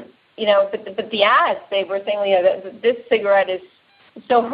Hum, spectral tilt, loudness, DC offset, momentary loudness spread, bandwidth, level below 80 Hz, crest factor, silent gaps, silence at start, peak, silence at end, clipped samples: none; -7.5 dB/octave; -19 LUFS; under 0.1%; 9 LU; 5.2 kHz; -70 dBFS; 18 dB; none; 0 s; -2 dBFS; 0 s; under 0.1%